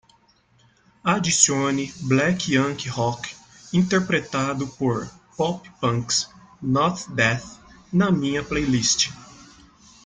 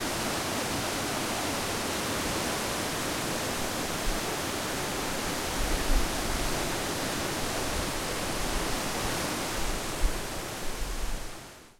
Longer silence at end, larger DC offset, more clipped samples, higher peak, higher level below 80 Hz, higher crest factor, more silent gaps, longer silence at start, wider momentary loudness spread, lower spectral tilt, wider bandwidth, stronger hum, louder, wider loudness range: first, 0.6 s vs 0.1 s; neither; neither; first, -2 dBFS vs -12 dBFS; second, -52 dBFS vs -38 dBFS; about the same, 22 dB vs 18 dB; neither; first, 1.05 s vs 0 s; first, 11 LU vs 5 LU; about the same, -4 dB/octave vs -3 dB/octave; second, 9.6 kHz vs 16.5 kHz; neither; first, -22 LUFS vs -31 LUFS; about the same, 3 LU vs 2 LU